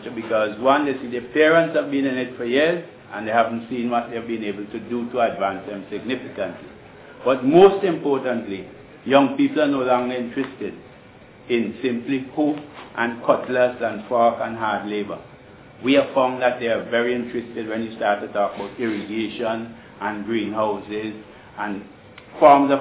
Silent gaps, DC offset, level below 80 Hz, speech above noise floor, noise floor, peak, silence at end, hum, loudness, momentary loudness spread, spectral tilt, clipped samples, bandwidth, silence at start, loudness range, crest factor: none; under 0.1%; -60 dBFS; 25 dB; -46 dBFS; -2 dBFS; 0 s; none; -21 LUFS; 15 LU; -9.5 dB/octave; under 0.1%; 4 kHz; 0 s; 6 LU; 20 dB